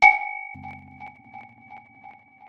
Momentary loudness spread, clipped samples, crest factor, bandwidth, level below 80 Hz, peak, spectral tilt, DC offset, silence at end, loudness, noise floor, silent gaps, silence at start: 21 LU; under 0.1%; 24 dB; 8 kHz; -66 dBFS; -2 dBFS; -2.5 dB/octave; under 0.1%; 0.7 s; -23 LUFS; -49 dBFS; none; 0 s